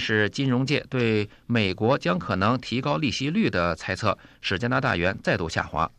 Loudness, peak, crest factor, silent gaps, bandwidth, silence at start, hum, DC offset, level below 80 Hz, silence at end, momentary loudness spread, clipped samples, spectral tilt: -25 LUFS; -8 dBFS; 18 dB; none; 11 kHz; 0 s; none; under 0.1%; -50 dBFS; 0.1 s; 4 LU; under 0.1%; -6 dB/octave